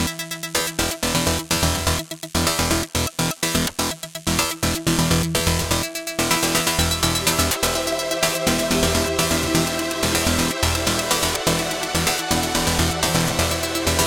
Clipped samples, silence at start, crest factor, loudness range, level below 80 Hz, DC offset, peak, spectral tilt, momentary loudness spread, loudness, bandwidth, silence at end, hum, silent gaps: under 0.1%; 0 s; 20 dB; 2 LU; -34 dBFS; under 0.1%; -2 dBFS; -3 dB/octave; 4 LU; -20 LUFS; 19 kHz; 0 s; none; none